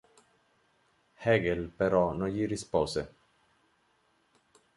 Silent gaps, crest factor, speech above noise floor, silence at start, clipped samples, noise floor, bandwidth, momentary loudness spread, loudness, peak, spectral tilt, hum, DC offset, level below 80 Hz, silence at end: none; 20 dB; 42 dB; 1.2 s; under 0.1%; -71 dBFS; 11.5 kHz; 8 LU; -30 LUFS; -12 dBFS; -6 dB/octave; none; under 0.1%; -54 dBFS; 1.7 s